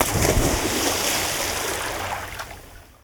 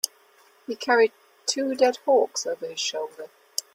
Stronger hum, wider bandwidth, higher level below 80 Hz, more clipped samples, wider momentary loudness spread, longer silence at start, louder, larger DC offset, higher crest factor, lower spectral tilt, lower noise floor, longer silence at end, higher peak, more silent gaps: neither; first, over 20 kHz vs 16.5 kHz; first, -34 dBFS vs -76 dBFS; neither; about the same, 14 LU vs 15 LU; about the same, 0 s vs 0.05 s; first, -22 LUFS vs -25 LUFS; neither; about the same, 22 dB vs 22 dB; first, -3 dB/octave vs -0.5 dB/octave; second, -43 dBFS vs -58 dBFS; about the same, 0.2 s vs 0.15 s; about the same, -2 dBFS vs -4 dBFS; neither